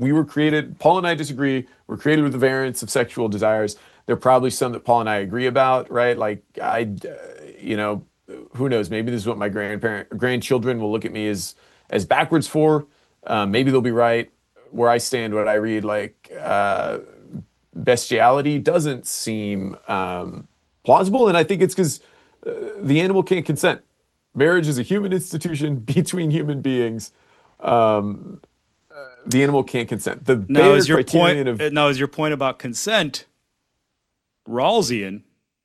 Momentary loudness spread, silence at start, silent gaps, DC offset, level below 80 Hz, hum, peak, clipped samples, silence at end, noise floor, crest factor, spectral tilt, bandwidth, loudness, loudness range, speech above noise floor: 15 LU; 0 s; none; under 0.1%; -60 dBFS; none; 0 dBFS; under 0.1%; 0.45 s; -76 dBFS; 20 dB; -5 dB/octave; 14 kHz; -20 LUFS; 6 LU; 57 dB